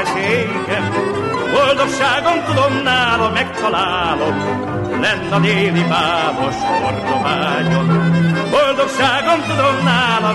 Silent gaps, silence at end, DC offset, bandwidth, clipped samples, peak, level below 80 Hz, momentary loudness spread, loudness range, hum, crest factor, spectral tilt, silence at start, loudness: none; 0 s; under 0.1%; 11.5 kHz; under 0.1%; -4 dBFS; -44 dBFS; 5 LU; 1 LU; none; 12 dB; -5.5 dB/octave; 0 s; -15 LUFS